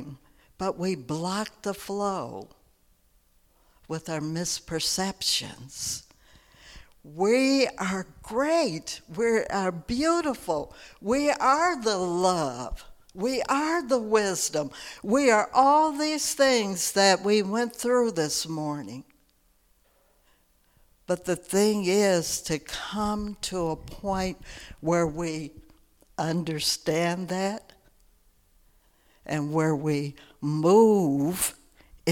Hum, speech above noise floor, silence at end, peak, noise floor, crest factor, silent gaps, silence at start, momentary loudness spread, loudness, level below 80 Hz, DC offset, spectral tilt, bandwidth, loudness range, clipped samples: none; 39 dB; 0 s; -6 dBFS; -65 dBFS; 20 dB; none; 0 s; 14 LU; -26 LUFS; -52 dBFS; under 0.1%; -4 dB/octave; 18.5 kHz; 9 LU; under 0.1%